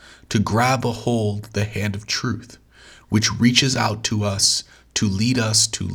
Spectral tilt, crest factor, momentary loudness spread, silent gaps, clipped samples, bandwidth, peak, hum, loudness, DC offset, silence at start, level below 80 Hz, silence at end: -3.5 dB/octave; 22 dB; 9 LU; none; under 0.1%; 18.5 kHz; 0 dBFS; none; -20 LUFS; under 0.1%; 0.3 s; -50 dBFS; 0 s